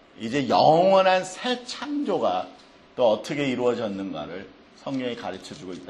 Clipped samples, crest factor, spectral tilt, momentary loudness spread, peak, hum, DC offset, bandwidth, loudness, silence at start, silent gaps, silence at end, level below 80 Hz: under 0.1%; 18 dB; -5 dB/octave; 20 LU; -6 dBFS; none; under 0.1%; 11.5 kHz; -24 LUFS; 0.2 s; none; 0 s; -64 dBFS